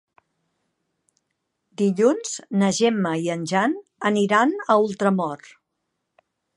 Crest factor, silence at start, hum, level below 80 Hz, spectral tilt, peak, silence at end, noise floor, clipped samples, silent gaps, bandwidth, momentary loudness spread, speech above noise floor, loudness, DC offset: 18 dB; 1.8 s; none; -74 dBFS; -5 dB/octave; -4 dBFS; 1.2 s; -78 dBFS; under 0.1%; none; 11.5 kHz; 7 LU; 57 dB; -21 LUFS; under 0.1%